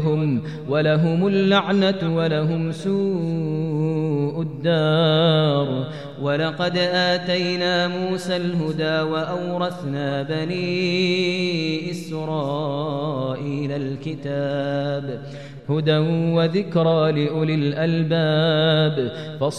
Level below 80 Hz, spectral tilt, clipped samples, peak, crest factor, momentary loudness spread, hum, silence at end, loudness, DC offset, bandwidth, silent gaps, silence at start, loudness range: -60 dBFS; -7 dB/octave; under 0.1%; -4 dBFS; 16 dB; 8 LU; none; 0 s; -21 LUFS; 0.3%; 10 kHz; none; 0 s; 5 LU